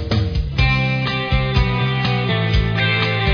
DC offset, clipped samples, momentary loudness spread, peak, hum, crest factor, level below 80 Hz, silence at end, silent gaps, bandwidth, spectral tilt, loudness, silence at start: under 0.1%; under 0.1%; 3 LU; -2 dBFS; none; 14 dB; -26 dBFS; 0 s; none; 5.4 kHz; -7 dB/octave; -18 LUFS; 0 s